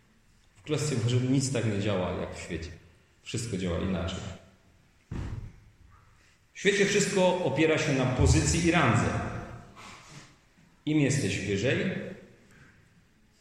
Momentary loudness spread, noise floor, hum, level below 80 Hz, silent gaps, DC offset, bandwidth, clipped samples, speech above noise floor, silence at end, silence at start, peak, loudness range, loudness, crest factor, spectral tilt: 22 LU; -62 dBFS; none; -46 dBFS; none; under 0.1%; 12.5 kHz; under 0.1%; 35 dB; 1.15 s; 0.65 s; -10 dBFS; 11 LU; -28 LUFS; 20 dB; -5 dB/octave